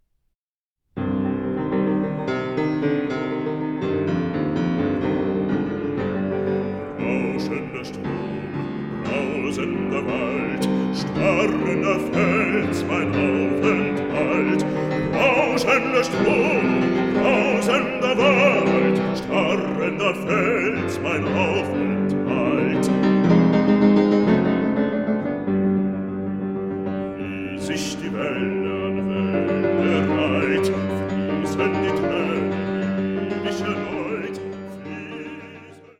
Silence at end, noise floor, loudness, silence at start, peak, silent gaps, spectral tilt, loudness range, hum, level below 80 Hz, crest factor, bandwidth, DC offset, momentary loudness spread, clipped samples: 0.2 s; -88 dBFS; -21 LUFS; 0.95 s; -4 dBFS; none; -6.5 dB/octave; 7 LU; none; -50 dBFS; 18 dB; 13 kHz; under 0.1%; 10 LU; under 0.1%